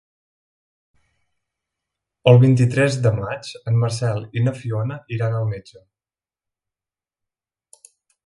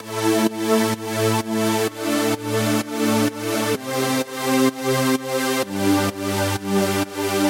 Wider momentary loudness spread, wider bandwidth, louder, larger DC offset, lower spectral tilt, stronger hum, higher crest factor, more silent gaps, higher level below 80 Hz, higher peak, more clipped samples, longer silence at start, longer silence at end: first, 14 LU vs 3 LU; second, 11 kHz vs 17 kHz; about the same, -19 LUFS vs -21 LUFS; neither; first, -7 dB/octave vs -4.5 dB/octave; neither; about the same, 20 dB vs 16 dB; neither; first, -54 dBFS vs -64 dBFS; first, 0 dBFS vs -6 dBFS; neither; first, 2.25 s vs 0 s; first, 2.7 s vs 0 s